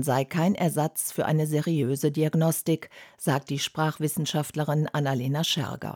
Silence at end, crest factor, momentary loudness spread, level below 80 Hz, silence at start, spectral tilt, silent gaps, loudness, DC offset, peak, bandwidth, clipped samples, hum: 0 s; 14 dB; 4 LU; -70 dBFS; 0 s; -5 dB/octave; none; -26 LUFS; under 0.1%; -12 dBFS; 18.5 kHz; under 0.1%; none